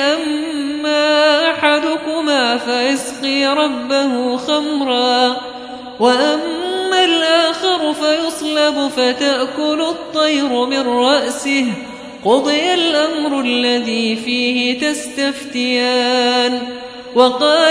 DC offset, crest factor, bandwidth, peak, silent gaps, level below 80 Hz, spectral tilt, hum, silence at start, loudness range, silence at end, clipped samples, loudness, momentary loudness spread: under 0.1%; 16 dB; 11 kHz; 0 dBFS; none; -58 dBFS; -2.5 dB/octave; none; 0 s; 1 LU; 0 s; under 0.1%; -15 LUFS; 7 LU